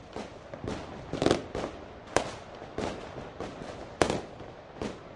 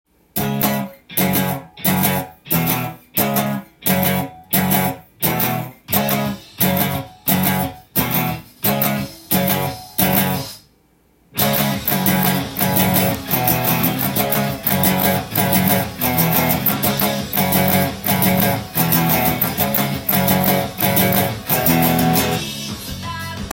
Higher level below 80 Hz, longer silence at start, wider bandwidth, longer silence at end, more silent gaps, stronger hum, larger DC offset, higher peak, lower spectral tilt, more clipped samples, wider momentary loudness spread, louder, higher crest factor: second, -52 dBFS vs -46 dBFS; second, 0 s vs 0.35 s; second, 11.5 kHz vs 17 kHz; about the same, 0 s vs 0 s; neither; neither; neither; second, -6 dBFS vs 0 dBFS; about the same, -4.5 dB/octave vs -4.5 dB/octave; neither; first, 15 LU vs 8 LU; second, -34 LUFS vs -17 LUFS; first, 28 dB vs 18 dB